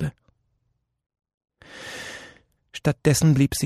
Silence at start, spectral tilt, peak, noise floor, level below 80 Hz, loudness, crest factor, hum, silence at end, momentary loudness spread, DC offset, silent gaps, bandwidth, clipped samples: 0 s; -5.5 dB/octave; -8 dBFS; -73 dBFS; -48 dBFS; -22 LUFS; 18 dB; none; 0 s; 22 LU; under 0.1%; 1.34-1.41 s; 14 kHz; under 0.1%